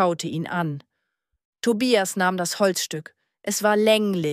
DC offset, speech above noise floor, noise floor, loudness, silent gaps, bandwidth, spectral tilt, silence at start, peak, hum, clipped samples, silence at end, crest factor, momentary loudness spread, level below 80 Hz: under 0.1%; 56 dB; -78 dBFS; -22 LUFS; 1.45-1.53 s; 15.5 kHz; -4 dB/octave; 0 s; -6 dBFS; none; under 0.1%; 0 s; 18 dB; 11 LU; -70 dBFS